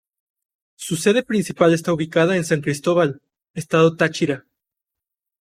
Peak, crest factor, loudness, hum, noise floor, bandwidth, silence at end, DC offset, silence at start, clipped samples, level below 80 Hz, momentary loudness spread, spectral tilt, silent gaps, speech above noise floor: -2 dBFS; 18 dB; -19 LUFS; none; -85 dBFS; 15.5 kHz; 1 s; under 0.1%; 0.8 s; under 0.1%; -60 dBFS; 14 LU; -5.5 dB/octave; 3.50-3.54 s; 67 dB